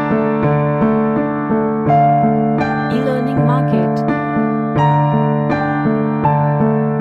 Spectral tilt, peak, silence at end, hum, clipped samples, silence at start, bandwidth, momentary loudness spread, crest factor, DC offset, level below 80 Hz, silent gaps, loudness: -10 dB/octave; -2 dBFS; 0 s; none; under 0.1%; 0 s; 5.6 kHz; 4 LU; 12 dB; under 0.1%; -44 dBFS; none; -15 LUFS